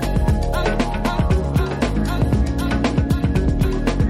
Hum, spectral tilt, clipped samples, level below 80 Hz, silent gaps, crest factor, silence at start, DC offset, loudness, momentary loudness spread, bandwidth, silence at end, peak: none; -7 dB/octave; under 0.1%; -22 dBFS; none; 14 dB; 0 s; under 0.1%; -20 LUFS; 2 LU; 15 kHz; 0 s; -4 dBFS